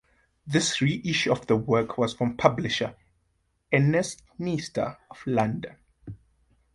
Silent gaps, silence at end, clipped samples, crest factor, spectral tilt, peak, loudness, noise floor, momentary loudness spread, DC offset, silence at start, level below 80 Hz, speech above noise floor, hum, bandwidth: none; 0.6 s; under 0.1%; 24 dB; -5 dB/octave; -4 dBFS; -26 LUFS; -72 dBFS; 13 LU; under 0.1%; 0.45 s; -58 dBFS; 46 dB; none; 11.5 kHz